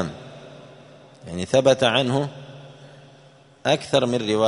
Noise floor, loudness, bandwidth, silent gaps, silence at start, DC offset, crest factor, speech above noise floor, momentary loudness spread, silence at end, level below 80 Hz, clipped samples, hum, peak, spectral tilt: -51 dBFS; -21 LUFS; 11 kHz; none; 0 s; under 0.1%; 22 dB; 31 dB; 25 LU; 0 s; -58 dBFS; under 0.1%; none; -2 dBFS; -5 dB/octave